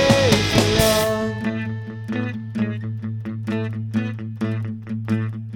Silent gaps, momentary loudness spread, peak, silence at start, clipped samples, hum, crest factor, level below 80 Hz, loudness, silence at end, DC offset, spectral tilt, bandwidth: none; 12 LU; 0 dBFS; 0 s; under 0.1%; none; 20 dB; -40 dBFS; -22 LUFS; 0 s; under 0.1%; -5 dB/octave; over 20 kHz